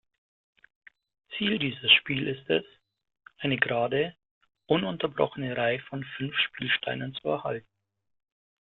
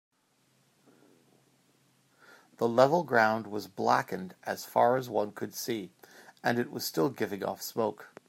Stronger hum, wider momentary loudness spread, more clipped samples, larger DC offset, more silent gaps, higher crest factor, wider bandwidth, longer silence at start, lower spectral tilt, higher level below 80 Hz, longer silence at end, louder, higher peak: neither; about the same, 14 LU vs 13 LU; neither; neither; first, 4.31-4.41 s vs none; about the same, 26 dB vs 24 dB; second, 4.3 kHz vs 16 kHz; second, 1.3 s vs 2.6 s; first, -8.5 dB/octave vs -5 dB/octave; first, -66 dBFS vs -80 dBFS; first, 1.05 s vs 0.2 s; first, -27 LUFS vs -30 LUFS; about the same, -6 dBFS vs -8 dBFS